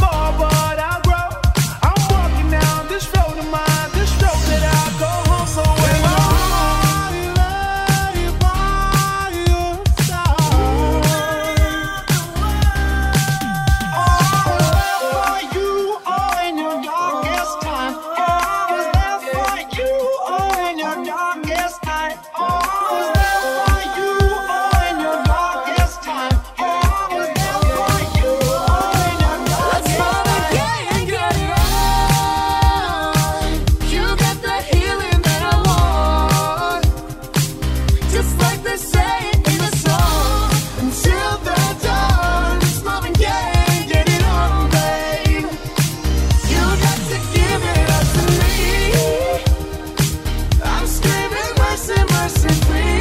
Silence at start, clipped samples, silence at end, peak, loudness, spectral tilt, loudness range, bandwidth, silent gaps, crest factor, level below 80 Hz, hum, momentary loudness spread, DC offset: 0 s; under 0.1%; 0 s; -2 dBFS; -17 LUFS; -4.5 dB/octave; 3 LU; 16.5 kHz; none; 14 dB; -20 dBFS; none; 5 LU; under 0.1%